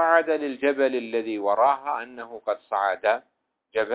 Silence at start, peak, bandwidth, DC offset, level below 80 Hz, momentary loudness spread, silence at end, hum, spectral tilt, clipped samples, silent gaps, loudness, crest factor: 0 s; -6 dBFS; 4 kHz; under 0.1%; -72 dBFS; 10 LU; 0 s; none; -7.5 dB/octave; under 0.1%; none; -25 LUFS; 18 dB